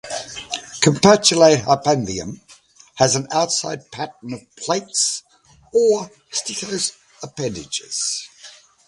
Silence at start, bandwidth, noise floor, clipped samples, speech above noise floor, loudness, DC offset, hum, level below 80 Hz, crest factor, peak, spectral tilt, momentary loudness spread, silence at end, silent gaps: 0.05 s; 11.5 kHz; -49 dBFS; under 0.1%; 30 dB; -19 LUFS; under 0.1%; none; -54 dBFS; 20 dB; 0 dBFS; -3.5 dB/octave; 17 LU; 0.35 s; none